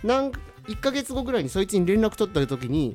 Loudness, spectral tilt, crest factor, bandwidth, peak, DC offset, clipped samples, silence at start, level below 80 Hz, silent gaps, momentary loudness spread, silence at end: -25 LUFS; -5.5 dB/octave; 16 dB; 16.5 kHz; -10 dBFS; under 0.1%; under 0.1%; 0 s; -42 dBFS; none; 8 LU; 0 s